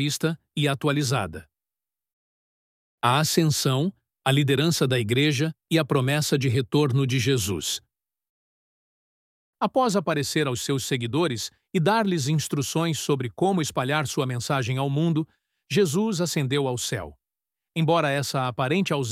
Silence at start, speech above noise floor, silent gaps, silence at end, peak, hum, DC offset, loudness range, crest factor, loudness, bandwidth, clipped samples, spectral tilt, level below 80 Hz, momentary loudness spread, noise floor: 0 s; over 66 dB; 2.13-2.98 s, 8.29-9.53 s; 0 s; -6 dBFS; none; under 0.1%; 5 LU; 18 dB; -24 LUFS; 16 kHz; under 0.1%; -5 dB/octave; -60 dBFS; 6 LU; under -90 dBFS